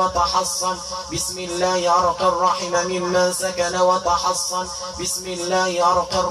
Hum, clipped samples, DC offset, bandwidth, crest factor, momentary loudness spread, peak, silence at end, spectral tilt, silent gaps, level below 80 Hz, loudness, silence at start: none; under 0.1%; under 0.1%; 15.5 kHz; 14 dB; 7 LU; -6 dBFS; 0 s; -2.5 dB/octave; none; -46 dBFS; -20 LUFS; 0 s